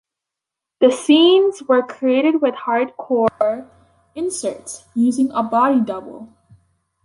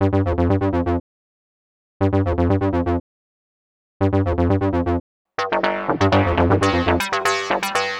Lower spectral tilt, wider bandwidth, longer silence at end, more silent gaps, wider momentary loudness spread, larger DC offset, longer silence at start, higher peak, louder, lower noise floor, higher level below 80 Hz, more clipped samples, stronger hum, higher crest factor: second, -4 dB/octave vs -6.5 dB/octave; second, 11.5 kHz vs 15.5 kHz; first, 0.8 s vs 0 s; second, none vs 1.00-2.00 s, 3.00-4.00 s, 5.00-5.25 s; first, 14 LU vs 7 LU; neither; first, 0.8 s vs 0 s; about the same, -2 dBFS vs -2 dBFS; first, -17 LUFS vs -20 LUFS; second, -85 dBFS vs under -90 dBFS; second, -64 dBFS vs -36 dBFS; neither; neither; about the same, 16 dB vs 18 dB